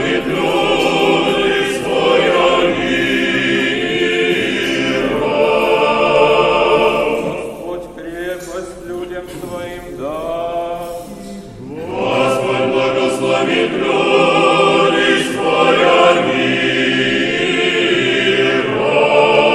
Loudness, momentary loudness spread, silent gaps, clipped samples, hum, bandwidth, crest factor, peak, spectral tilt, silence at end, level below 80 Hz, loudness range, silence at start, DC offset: -14 LUFS; 15 LU; none; under 0.1%; none; 14 kHz; 14 dB; 0 dBFS; -4.5 dB/octave; 0 s; -44 dBFS; 12 LU; 0 s; under 0.1%